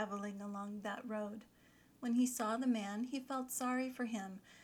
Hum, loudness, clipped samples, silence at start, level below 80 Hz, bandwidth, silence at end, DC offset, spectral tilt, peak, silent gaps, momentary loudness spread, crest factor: 60 Hz at -75 dBFS; -40 LUFS; under 0.1%; 0 s; -80 dBFS; 19 kHz; 0 s; under 0.1%; -4 dB/octave; -26 dBFS; none; 10 LU; 14 dB